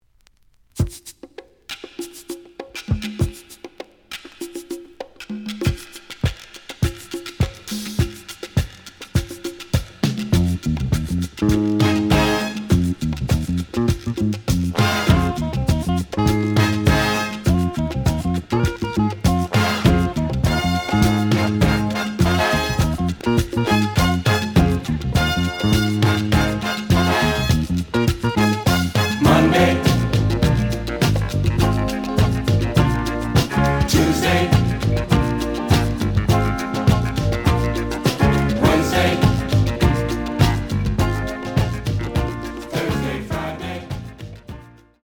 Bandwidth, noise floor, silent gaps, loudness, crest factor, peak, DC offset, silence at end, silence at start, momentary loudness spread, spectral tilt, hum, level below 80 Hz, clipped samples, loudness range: over 20 kHz; -56 dBFS; none; -19 LUFS; 18 dB; -2 dBFS; under 0.1%; 0.4 s; 0.75 s; 15 LU; -6 dB/octave; none; -30 dBFS; under 0.1%; 10 LU